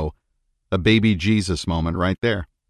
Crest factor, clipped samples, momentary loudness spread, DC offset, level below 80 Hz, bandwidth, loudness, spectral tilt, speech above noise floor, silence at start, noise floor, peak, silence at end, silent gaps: 18 dB; under 0.1%; 7 LU; under 0.1%; -34 dBFS; 11.5 kHz; -21 LUFS; -6 dB/octave; 51 dB; 0 s; -70 dBFS; -4 dBFS; 0.25 s; none